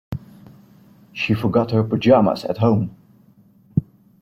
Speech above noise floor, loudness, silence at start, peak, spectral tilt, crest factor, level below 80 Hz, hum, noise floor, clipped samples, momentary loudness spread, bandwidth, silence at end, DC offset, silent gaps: 35 dB; -19 LUFS; 0.1 s; -2 dBFS; -8.5 dB/octave; 18 dB; -50 dBFS; none; -52 dBFS; under 0.1%; 16 LU; 14.5 kHz; 0.4 s; under 0.1%; none